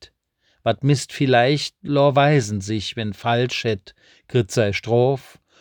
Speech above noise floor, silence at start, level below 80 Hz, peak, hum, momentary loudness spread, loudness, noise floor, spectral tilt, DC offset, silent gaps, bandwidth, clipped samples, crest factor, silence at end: 46 dB; 0 s; -60 dBFS; -4 dBFS; none; 9 LU; -20 LUFS; -66 dBFS; -5.5 dB/octave; under 0.1%; none; 19.5 kHz; under 0.1%; 18 dB; 0.4 s